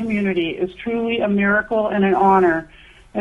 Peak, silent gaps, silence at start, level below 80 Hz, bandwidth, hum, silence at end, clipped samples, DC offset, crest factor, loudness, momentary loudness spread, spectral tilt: -4 dBFS; none; 0 s; -48 dBFS; 5.6 kHz; none; 0 s; under 0.1%; under 0.1%; 14 dB; -18 LUFS; 10 LU; -8 dB/octave